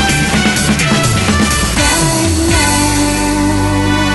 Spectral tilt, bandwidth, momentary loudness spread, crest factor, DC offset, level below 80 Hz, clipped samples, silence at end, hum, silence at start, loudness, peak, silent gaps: -3.5 dB/octave; 12.5 kHz; 2 LU; 12 dB; under 0.1%; -22 dBFS; under 0.1%; 0 s; none; 0 s; -11 LUFS; 0 dBFS; none